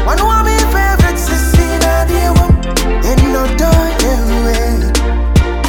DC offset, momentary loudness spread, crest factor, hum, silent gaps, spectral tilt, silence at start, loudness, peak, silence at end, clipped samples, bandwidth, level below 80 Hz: under 0.1%; 3 LU; 10 dB; none; none; -5 dB/octave; 0 s; -12 LUFS; 0 dBFS; 0 s; under 0.1%; 18.5 kHz; -12 dBFS